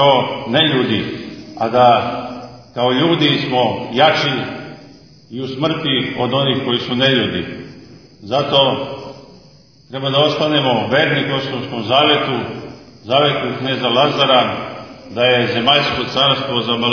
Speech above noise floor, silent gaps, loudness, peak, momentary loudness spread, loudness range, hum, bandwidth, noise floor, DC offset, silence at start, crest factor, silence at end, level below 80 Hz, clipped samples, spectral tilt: 30 dB; none; -15 LUFS; 0 dBFS; 17 LU; 3 LU; none; 5.4 kHz; -46 dBFS; 0.2%; 0 s; 16 dB; 0 s; -54 dBFS; under 0.1%; -6 dB/octave